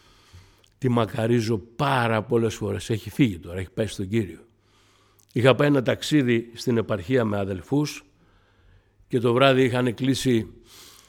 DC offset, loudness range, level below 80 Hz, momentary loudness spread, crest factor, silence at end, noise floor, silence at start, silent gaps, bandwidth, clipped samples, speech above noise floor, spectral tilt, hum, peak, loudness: under 0.1%; 3 LU; -54 dBFS; 10 LU; 22 dB; 0.25 s; -60 dBFS; 0.35 s; none; 17 kHz; under 0.1%; 37 dB; -6 dB/octave; none; -2 dBFS; -23 LUFS